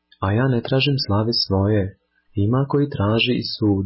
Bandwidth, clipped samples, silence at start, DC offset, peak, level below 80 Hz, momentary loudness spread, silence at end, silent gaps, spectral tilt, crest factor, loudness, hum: 5.8 kHz; under 0.1%; 0.2 s; under 0.1%; -8 dBFS; -40 dBFS; 4 LU; 0 s; none; -10 dB/octave; 12 dB; -20 LUFS; none